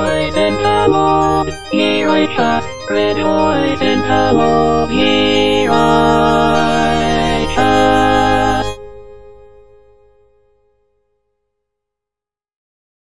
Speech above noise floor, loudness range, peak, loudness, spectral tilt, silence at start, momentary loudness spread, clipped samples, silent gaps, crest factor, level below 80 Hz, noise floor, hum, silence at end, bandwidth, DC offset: 76 dB; 5 LU; 0 dBFS; -13 LUFS; -5 dB/octave; 0 s; 5 LU; under 0.1%; none; 14 dB; -34 dBFS; -88 dBFS; none; 0.6 s; 10.5 kHz; under 0.1%